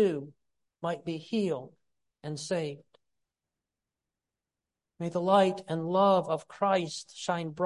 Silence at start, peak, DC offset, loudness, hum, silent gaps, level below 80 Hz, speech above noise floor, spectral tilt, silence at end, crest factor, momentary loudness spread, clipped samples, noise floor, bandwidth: 0 s; -10 dBFS; under 0.1%; -30 LUFS; none; none; -76 dBFS; 61 dB; -5.5 dB/octave; 0 s; 22 dB; 15 LU; under 0.1%; -90 dBFS; 11.5 kHz